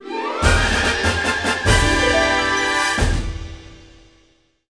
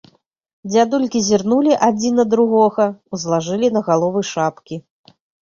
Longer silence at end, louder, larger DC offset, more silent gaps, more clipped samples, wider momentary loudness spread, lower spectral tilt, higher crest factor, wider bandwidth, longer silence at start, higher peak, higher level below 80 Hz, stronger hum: first, 0.95 s vs 0.6 s; about the same, -17 LUFS vs -17 LUFS; first, 0.1% vs under 0.1%; neither; neither; about the same, 10 LU vs 10 LU; second, -3.5 dB/octave vs -5 dB/octave; about the same, 18 dB vs 16 dB; first, 10.5 kHz vs 7.6 kHz; second, 0 s vs 0.65 s; about the same, -2 dBFS vs -2 dBFS; first, -26 dBFS vs -58 dBFS; neither